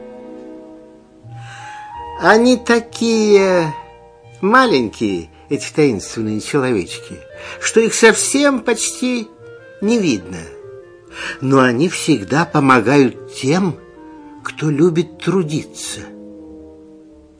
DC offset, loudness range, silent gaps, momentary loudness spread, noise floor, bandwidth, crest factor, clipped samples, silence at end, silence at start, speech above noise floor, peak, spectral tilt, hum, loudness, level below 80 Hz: under 0.1%; 5 LU; none; 23 LU; -42 dBFS; 11 kHz; 16 dB; under 0.1%; 0.65 s; 0 s; 27 dB; 0 dBFS; -4.5 dB/octave; none; -15 LUFS; -52 dBFS